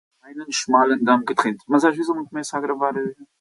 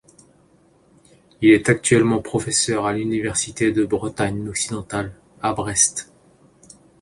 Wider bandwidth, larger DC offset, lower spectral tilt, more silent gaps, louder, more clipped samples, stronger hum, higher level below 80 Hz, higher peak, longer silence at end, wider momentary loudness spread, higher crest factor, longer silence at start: about the same, 11.5 kHz vs 11.5 kHz; neither; about the same, -4 dB/octave vs -4 dB/octave; neither; about the same, -21 LUFS vs -20 LUFS; neither; neither; second, -70 dBFS vs -50 dBFS; about the same, -4 dBFS vs -2 dBFS; second, 0.15 s vs 1 s; about the same, 11 LU vs 11 LU; about the same, 18 dB vs 20 dB; second, 0.25 s vs 1.4 s